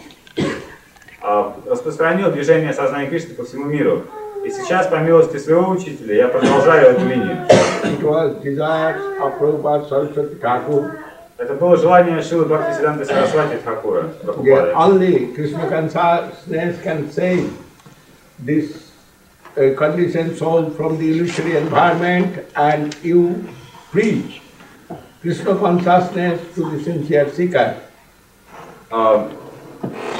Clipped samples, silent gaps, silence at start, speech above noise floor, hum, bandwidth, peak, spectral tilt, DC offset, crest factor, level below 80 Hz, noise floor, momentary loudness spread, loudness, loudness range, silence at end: under 0.1%; none; 0 s; 33 dB; none; 15 kHz; 0 dBFS; -6.5 dB/octave; under 0.1%; 16 dB; -56 dBFS; -49 dBFS; 14 LU; -17 LUFS; 6 LU; 0 s